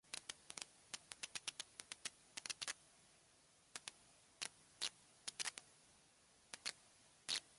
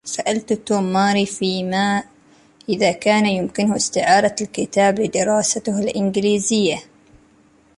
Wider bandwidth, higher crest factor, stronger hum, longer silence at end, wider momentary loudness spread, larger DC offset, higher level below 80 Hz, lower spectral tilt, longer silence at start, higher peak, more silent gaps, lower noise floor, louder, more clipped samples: about the same, 11.5 kHz vs 11.5 kHz; first, 30 dB vs 16 dB; neither; second, 0 s vs 0.95 s; first, 22 LU vs 6 LU; neither; second, -86 dBFS vs -56 dBFS; second, 1 dB/octave vs -4 dB/octave; about the same, 0.05 s vs 0.05 s; second, -22 dBFS vs -2 dBFS; neither; first, -72 dBFS vs -54 dBFS; second, -50 LUFS vs -19 LUFS; neither